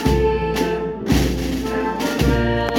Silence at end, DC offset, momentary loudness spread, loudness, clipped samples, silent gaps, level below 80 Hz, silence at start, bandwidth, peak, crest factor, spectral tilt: 0 s; under 0.1%; 5 LU; -20 LUFS; under 0.1%; none; -26 dBFS; 0 s; 17.5 kHz; -4 dBFS; 16 dB; -6 dB/octave